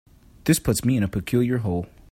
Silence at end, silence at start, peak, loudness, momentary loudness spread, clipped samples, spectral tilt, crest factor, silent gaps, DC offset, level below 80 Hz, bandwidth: 0.25 s; 0.45 s; -4 dBFS; -23 LUFS; 8 LU; under 0.1%; -5.5 dB/octave; 18 dB; none; under 0.1%; -44 dBFS; 16.5 kHz